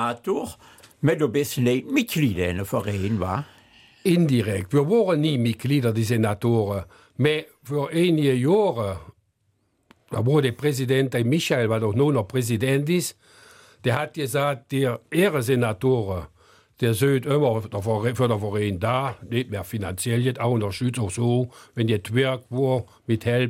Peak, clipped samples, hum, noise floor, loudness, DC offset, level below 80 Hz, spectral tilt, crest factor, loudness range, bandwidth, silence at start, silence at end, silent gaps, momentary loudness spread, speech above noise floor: -6 dBFS; under 0.1%; none; -69 dBFS; -23 LUFS; under 0.1%; -56 dBFS; -6 dB/octave; 16 dB; 2 LU; 16.5 kHz; 0 s; 0 s; none; 8 LU; 47 dB